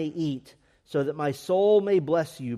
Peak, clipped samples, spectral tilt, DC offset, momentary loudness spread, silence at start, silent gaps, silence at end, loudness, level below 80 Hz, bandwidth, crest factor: -12 dBFS; under 0.1%; -7 dB/octave; under 0.1%; 11 LU; 0 s; none; 0 s; -25 LUFS; -68 dBFS; 14 kHz; 14 dB